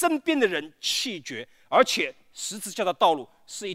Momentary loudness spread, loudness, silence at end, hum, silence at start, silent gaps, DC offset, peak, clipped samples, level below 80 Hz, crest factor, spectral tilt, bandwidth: 14 LU; -25 LUFS; 0 s; none; 0 s; none; under 0.1%; -6 dBFS; under 0.1%; -74 dBFS; 22 dB; -2 dB/octave; 16 kHz